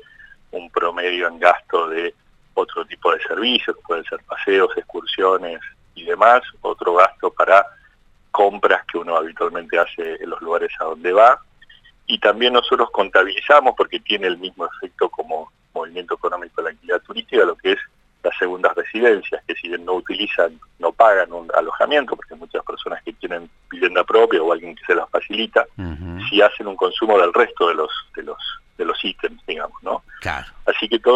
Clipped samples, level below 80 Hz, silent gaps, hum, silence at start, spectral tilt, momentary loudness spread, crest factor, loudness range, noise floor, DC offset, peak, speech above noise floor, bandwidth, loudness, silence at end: under 0.1%; -52 dBFS; none; none; 0.55 s; -4.5 dB/octave; 15 LU; 18 dB; 5 LU; -53 dBFS; under 0.1%; 0 dBFS; 35 dB; 9 kHz; -19 LUFS; 0 s